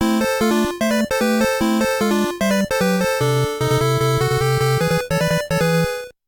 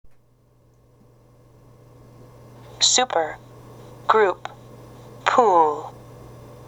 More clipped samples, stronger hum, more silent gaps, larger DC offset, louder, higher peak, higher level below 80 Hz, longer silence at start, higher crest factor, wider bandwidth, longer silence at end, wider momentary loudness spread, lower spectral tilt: neither; neither; neither; neither; about the same, -18 LUFS vs -19 LUFS; second, -8 dBFS vs 0 dBFS; first, -40 dBFS vs -58 dBFS; second, 0 s vs 2.75 s; second, 10 dB vs 24 dB; about the same, over 20 kHz vs 18.5 kHz; about the same, 0.15 s vs 0.05 s; second, 2 LU vs 27 LU; first, -5.5 dB/octave vs -1.5 dB/octave